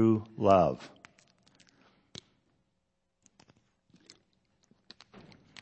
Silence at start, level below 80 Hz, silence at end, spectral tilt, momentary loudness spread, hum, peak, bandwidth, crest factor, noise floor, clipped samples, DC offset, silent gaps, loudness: 0 s; -66 dBFS; 4.75 s; -8 dB/octave; 29 LU; none; -10 dBFS; 8.4 kHz; 24 dB; -80 dBFS; under 0.1%; under 0.1%; none; -27 LUFS